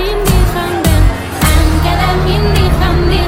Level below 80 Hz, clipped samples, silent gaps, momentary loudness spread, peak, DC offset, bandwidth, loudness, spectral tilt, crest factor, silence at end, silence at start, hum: -14 dBFS; under 0.1%; none; 3 LU; 0 dBFS; under 0.1%; 16.5 kHz; -12 LUFS; -5.5 dB/octave; 10 dB; 0 s; 0 s; none